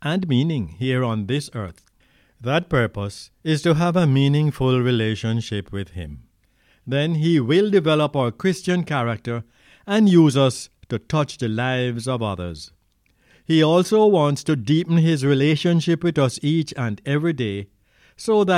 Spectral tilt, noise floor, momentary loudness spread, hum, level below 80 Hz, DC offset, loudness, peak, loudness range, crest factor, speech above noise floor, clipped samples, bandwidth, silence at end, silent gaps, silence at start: -6.5 dB/octave; -63 dBFS; 14 LU; none; -50 dBFS; under 0.1%; -20 LUFS; -4 dBFS; 4 LU; 18 dB; 43 dB; under 0.1%; 13.5 kHz; 0 s; none; 0 s